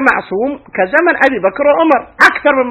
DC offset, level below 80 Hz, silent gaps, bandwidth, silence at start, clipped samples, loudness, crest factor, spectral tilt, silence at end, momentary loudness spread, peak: under 0.1%; -48 dBFS; none; 16 kHz; 0 s; 0.6%; -11 LUFS; 12 dB; -4.5 dB/octave; 0 s; 9 LU; 0 dBFS